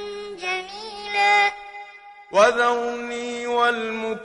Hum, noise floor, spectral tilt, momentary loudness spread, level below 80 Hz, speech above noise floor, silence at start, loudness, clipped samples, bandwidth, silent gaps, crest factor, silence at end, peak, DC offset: none; -44 dBFS; -2 dB/octave; 18 LU; -62 dBFS; 23 dB; 0 s; -21 LUFS; under 0.1%; 11 kHz; none; 18 dB; 0 s; -4 dBFS; under 0.1%